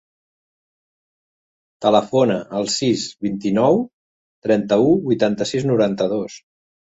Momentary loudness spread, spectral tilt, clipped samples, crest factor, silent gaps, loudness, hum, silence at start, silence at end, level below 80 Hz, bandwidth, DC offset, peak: 9 LU; -5.5 dB/octave; under 0.1%; 18 dB; 3.93-4.42 s; -19 LUFS; none; 1.8 s; 0.55 s; -58 dBFS; 8.2 kHz; under 0.1%; -2 dBFS